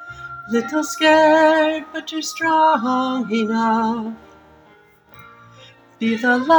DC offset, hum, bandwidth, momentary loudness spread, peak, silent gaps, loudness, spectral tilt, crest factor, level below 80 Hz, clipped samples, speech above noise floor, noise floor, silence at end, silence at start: under 0.1%; none; over 20 kHz; 14 LU; -2 dBFS; none; -18 LUFS; -4 dB/octave; 16 dB; -60 dBFS; under 0.1%; 34 dB; -51 dBFS; 0 s; 0 s